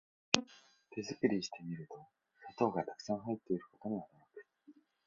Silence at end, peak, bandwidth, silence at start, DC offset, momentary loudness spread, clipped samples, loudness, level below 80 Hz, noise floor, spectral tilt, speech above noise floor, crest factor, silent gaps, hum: 0.35 s; -2 dBFS; 7.4 kHz; 0.35 s; under 0.1%; 23 LU; under 0.1%; -38 LUFS; -78 dBFS; -65 dBFS; -3.5 dB/octave; 26 dB; 38 dB; none; none